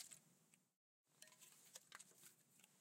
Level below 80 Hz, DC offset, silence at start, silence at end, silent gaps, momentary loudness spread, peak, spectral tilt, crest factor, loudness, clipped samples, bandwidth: under -90 dBFS; under 0.1%; 0 s; 0 s; 0.76-1.04 s; 7 LU; -40 dBFS; -0.5 dB/octave; 28 dB; -63 LUFS; under 0.1%; 16 kHz